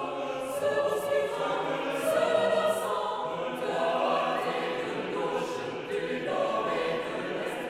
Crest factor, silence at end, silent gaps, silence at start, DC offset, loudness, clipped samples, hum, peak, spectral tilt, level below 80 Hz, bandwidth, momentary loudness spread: 16 dB; 0 s; none; 0 s; under 0.1%; -29 LUFS; under 0.1%; none; -14 dBFS; -4 dB/octave; -66 dBFS; 16 kHz; 7 LU